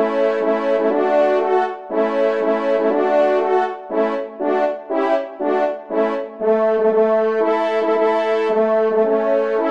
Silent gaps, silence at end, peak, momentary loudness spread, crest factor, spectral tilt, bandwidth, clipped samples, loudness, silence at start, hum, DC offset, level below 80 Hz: none; 0 s; -6 dBFS; 5 LU; 12 dB; -6.5 dB/octave; 7.4 kHz; under 0.1%; -18 LUFS; 0 s; none; 0.3%; -68 dBFS